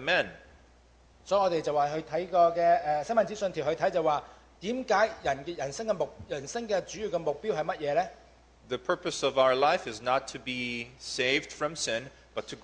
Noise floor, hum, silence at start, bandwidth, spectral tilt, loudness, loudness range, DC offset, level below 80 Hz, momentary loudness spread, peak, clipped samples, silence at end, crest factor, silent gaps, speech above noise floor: -59 dBFS; none; 0 s; 10 kHz; -3.5 dB/octave; -29 LUFS; 5 LU; under 0.1%; -60 dBFS; 11 LU; -12 dBFS; under 0.1%; 0.05 s; 18 dB; none; 30 dB